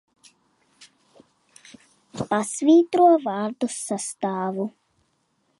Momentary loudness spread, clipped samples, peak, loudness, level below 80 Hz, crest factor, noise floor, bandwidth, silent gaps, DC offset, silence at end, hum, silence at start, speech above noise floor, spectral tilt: 14 LU; under 0.1%; -6 dBFS; -22 LUFS; -68 dBFS; 18 dB; -69 dBFS; 11.5 kHz; none; under 0.1%; 0.9 s; none; 2.15 s; 48 dB; -5 dB/octave